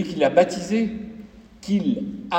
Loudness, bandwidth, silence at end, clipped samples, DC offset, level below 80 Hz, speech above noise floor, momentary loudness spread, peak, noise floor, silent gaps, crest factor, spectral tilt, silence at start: -22 LUFS; 9 kHz; 0 s; under 0.1%; under 0.1%; -54 dBFS; 22 dB; 20 LU; -2 dBFS; -43 dBFS; none; 20 dB; -6 dB/octave; 0 s